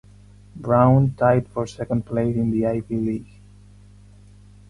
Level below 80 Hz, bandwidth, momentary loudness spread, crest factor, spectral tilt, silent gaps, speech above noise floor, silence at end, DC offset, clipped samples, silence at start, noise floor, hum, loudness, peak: -48 dBFS; 10.5 kHz; 12 LU; 18 dB; -9.5 dB/octave; none; 27 dB; 1.45 s; under 0.1%; under 0.1%; 0.55 s; -47 dBFS; 50 Hz at -40 dBFS; -21 LUFS; -4 dBFS